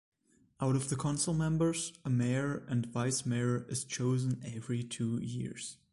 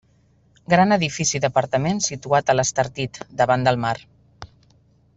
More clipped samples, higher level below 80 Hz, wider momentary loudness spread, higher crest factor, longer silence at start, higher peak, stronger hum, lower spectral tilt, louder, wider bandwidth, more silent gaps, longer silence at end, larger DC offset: neither; second, -62 dBFS vs -54 dBFS; about the same, 7 LU vs 8 LU; about the same, 14 dB vs 18 dB; about the same, 0.6 s vs 0.7 s; second, -20 dBFS vs -4 dBFS; neither; first, -5.5 dB/octave vs -4 dB/octave; second, -34 LUFS vs -20 LUFS; first, 11.5 kHz vs 8.2 kHz; neither; second, 0.2 s vs 0.7 s; neither